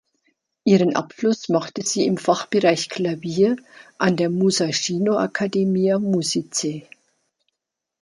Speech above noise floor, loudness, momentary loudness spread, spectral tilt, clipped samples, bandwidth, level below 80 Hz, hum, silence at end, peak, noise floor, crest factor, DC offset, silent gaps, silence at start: 62 dB; -21 LUFS; 6 LU; -4.5 dB/octave; under 0.1%; 11.5 kHz; -66 dBFS; none; 1.2 s; -2 dBFS; -83 dBFS; 18 dB; under 0.1%; none; 0.65 s